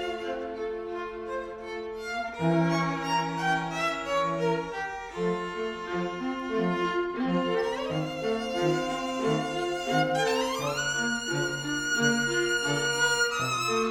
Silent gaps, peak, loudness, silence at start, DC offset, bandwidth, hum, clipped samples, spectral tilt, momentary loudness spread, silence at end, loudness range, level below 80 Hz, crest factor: none; -12 dBFS; -28 LUFS; 0 s; under 0.1%; 17 kHz; none; under 0.1%; -4 dB/octave; 9 LU; 0 s; 4 LU; -56 dBFS; 16 dB